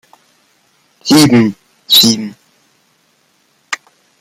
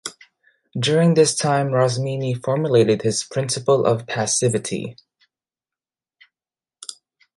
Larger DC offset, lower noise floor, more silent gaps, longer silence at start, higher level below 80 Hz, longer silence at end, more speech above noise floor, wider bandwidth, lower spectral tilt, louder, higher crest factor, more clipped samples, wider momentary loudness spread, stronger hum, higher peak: neither; second, -56 dBFS vs under -90 dBFS; neither; first, 1.05 s vs 0.05 s; first, -54 dBFS vs -62 dBFS; about the same, 0.45 s vs 0.45 s; second, 48 dB vs over 71 dB; first, 16.5 kHz vs 11.5 kHz; about the same, -3.5 dB/octave vs -4.5 dB/octave; first, -9 LUFS vs -19 LUFS; about the same, 14 dB vs 18 dB; neither; about the same, 17 LU vs 18 LU; neither; about the same, 0 dBFS vs -2 dBFS